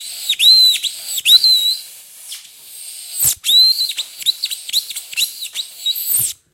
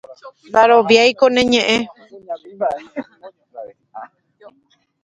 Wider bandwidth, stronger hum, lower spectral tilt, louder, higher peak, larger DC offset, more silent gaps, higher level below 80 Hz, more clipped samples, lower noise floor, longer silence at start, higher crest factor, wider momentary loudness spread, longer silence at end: first, 16.5 kHz vs 9.4 kHz; neither; second, 3.5 dB/octave vs -3.5 dB/octave; about the same, -12 LUFS vs -14 LUFS; about the same, 0 dBFS vs 0 dBFS; neither; neither; about the same, -60 dBFS vs -56 dBFS; neither; second, -37 dBFS vs -60 dBFS; about the same, 0 s vs 0.1 s; about the same, 16 dB vs 18 dB; second, 22 LU vs 25 LU; second, 0.2 s vs 1 s